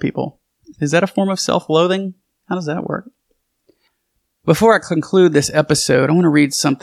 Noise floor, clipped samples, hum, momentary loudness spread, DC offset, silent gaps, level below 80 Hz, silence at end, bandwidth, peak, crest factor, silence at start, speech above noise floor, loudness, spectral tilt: -70 dBFS; under 0.1%; none; 13 LU; under 0.1%; none; -52 dBFS; 0.05 s; 15 kHz; 0 dBFS; 16 dB; 0 s; 55 dB; -16 LUFS; -5 dB/octave